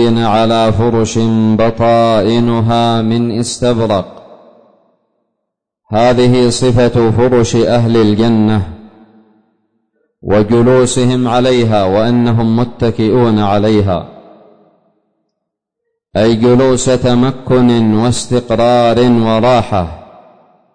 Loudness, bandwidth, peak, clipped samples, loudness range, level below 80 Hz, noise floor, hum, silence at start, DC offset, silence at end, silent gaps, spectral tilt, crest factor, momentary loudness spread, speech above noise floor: -11 LUFS; 9.6 kHz; -2 dBFS; under 0.1%; 5 LU; -36 dBFS; -74 dBFS; none; 0 s; under 0.1%; 0.75 s; none; -6.5 dB/octave; 10 dB; 6 LU; 64 dB